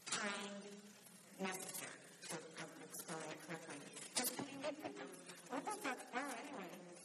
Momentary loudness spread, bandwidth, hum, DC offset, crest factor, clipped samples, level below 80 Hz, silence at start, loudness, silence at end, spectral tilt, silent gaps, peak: 12 LU; 13.5 kHz; none; under 0.1%; 26 dB; under 0.1%; under -90 dBFS; 0 s; -47 LUFS; 0 s; -2.5 dB/octave; none; -24 dBFS